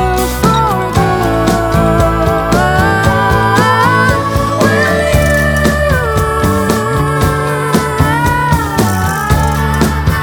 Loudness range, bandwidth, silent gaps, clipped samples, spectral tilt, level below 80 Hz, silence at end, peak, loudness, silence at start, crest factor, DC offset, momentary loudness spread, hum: 2 LU; over 20 kHz; none; under 0.1%; -5.5 dB/octave; -22 dBFS; 0 s; 0 dBFS; -11 LUFS; 0 s; 10 dB; under 0.1%; 3 LU; none